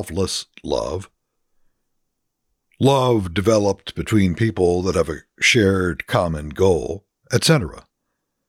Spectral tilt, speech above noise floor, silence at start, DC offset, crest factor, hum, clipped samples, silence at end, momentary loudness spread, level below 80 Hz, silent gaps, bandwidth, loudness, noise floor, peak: -5 dB/octave; 57 dB; 0 s; under 0.1%; 18 dB; none; under 0.1%; 0.7 s; 11 LU; -42 dBFS; none; 16.5 kHz; -19 LUFS; -76 dBFS; -2 dBFS